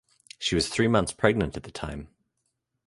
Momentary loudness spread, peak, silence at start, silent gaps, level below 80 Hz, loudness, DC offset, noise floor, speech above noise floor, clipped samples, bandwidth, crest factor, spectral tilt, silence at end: 13 LU; -4 dBFS; 0.4 s; none; -46 dBFS; -26 LUFS; under 0.1%; -78 dBFS; 52 dB; under 0.1%; 11.5 kHz; 24 dB; -4.5 dB/octave; 0.8 s